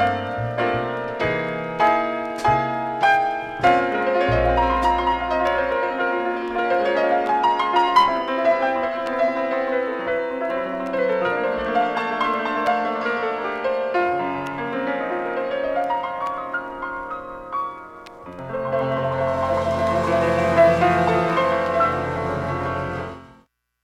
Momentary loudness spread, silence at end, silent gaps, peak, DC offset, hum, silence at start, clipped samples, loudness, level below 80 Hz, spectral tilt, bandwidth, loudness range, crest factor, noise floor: 10 LU; 0.5 s; none; -4 dBFS; under 0.1%; none; 0 s; under 0.1%; -21 LUFS; -42 dBFS; -6 dB/octave; 12.5 kHz; 6 LU; 18 dB; -57 dBFS